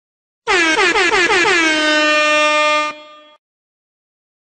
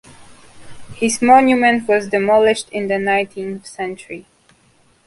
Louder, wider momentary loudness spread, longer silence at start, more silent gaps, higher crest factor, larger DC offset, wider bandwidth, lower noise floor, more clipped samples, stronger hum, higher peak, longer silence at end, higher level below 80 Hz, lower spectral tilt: first, -13 LUFS vs -16 LUFS; second, 5 LU vs 17 LU; first, 0.45 s vs 0.2 s; neither; about the same, 14 dB vs 18 dB; neither; second, 9.4 kHz vs 11.5 kHz; second, -35 dBFS vs -55 dBFS; neither; neither; about the same, -2 dBFS vs 0 dBFS; first, 1.5 s vs 0.85 s; about the same, -50 dBFS vs -54 dBFS; second, -1 dB/octave vs -4 dB/octave